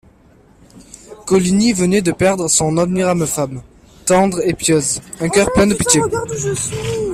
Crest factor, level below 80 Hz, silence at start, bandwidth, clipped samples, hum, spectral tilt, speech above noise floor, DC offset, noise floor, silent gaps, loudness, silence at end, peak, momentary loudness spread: 16 dB; -40 dBFS; 0.75 s; 15.5 kHz; under 0.1%; none; -4.5 dB/octave; 33 dB; under 0.1%; -48 dBFS; none; -15 LUFS; 0 s; 0 dBFS; 8 LU